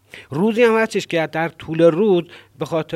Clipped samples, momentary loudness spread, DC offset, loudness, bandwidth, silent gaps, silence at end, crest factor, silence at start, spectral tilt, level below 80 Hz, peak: under 0.1%; 9 LU; under 0.1%; -18 LUFS; 13.5 kHz; none; 0 s; 16 dB; 0.15 s; -6 dB/octave; -60 dBFS; -2 dBFS